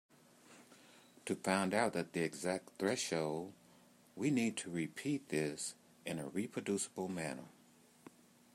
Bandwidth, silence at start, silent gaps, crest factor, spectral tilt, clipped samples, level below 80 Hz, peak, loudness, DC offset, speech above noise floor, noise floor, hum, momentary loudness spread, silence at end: 16 kHz; 0.5 s; none; 22 dB; -4.5 dB/octave; under 0.1%; -82 dBFS; -18 dBFS; -39 LUFS; under 0.1%; 28 dB; -66 dBFS; none; 15 LU; 1.05 s